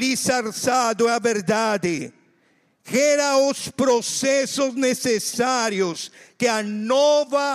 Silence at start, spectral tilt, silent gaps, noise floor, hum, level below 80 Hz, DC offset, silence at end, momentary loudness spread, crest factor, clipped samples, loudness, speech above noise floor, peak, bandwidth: 0 s; -3 dB/octave; none; -63 dBFS; none; -68 dBFS; under 0.1%; 0 s; 7 LU; 12 dB; under 0.1%; -21 LUFS; 42 dB; -8 dBFS; 15.5 kHz